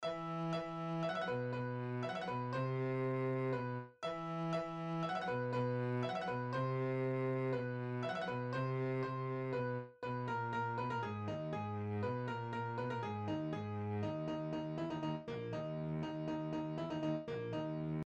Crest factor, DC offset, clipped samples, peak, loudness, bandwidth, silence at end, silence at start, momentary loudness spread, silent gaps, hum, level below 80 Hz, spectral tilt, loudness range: 14 dB; under 0.1%; under 0.1%; -26 dBFS; -40 LUFS; 8.4 kHz; 0.05 s; 0 s; 4 LU; none; none; -72 dBFS; -8 dB/octave; 3 LU